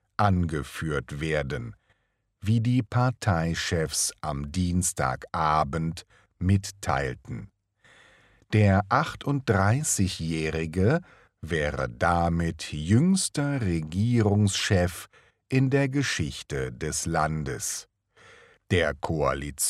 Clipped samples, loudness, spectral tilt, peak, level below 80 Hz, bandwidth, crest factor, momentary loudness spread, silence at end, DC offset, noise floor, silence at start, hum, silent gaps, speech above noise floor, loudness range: under 0.1%; -26 LUFS; -5 dB/octave; -8 dBFS; -46 dBFS; 14.5 kHz; 20 dB; 9 LU; 0 s; under 0.1%; -73 dBFS; 0.2 s; none; none; 48 dB; 4 LU